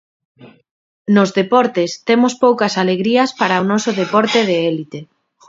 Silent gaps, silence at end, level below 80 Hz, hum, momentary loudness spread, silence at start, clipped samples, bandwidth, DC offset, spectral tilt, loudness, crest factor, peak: 0.71-1.05 s; 0.45 s; -64 dBFS; none; 6 LU; 0.4 s; under 0.1%; 7.8 kHz; under 0.1%; -5 dB/octave; -15 LUFS; 16 dB; 0 dBFS